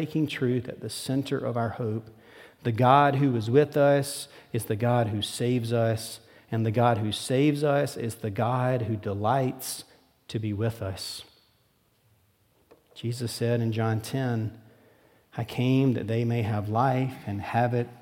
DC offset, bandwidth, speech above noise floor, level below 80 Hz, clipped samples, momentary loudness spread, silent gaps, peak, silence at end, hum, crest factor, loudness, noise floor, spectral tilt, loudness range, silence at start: under 0.1%; 17 kHz; 41 dB; -68 dBFS; under 0.1%; 12 LU; none; -4 dBFS; 0.05 s; none; 22 dB; -27 LUFS; -67 dBFS; -6.5 dB/octave; 9 LU; 0 s